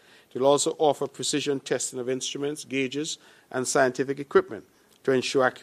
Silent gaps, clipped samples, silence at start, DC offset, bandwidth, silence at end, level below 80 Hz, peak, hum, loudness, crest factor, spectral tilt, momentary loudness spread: none; under 0.1%; 0.35 s; under 0.1%; 15 kHz; 0 s; -72 dBFS; -6 dBFS; none; -26 LUFS; 20 dB; -3.5 dB/octave; 11 LU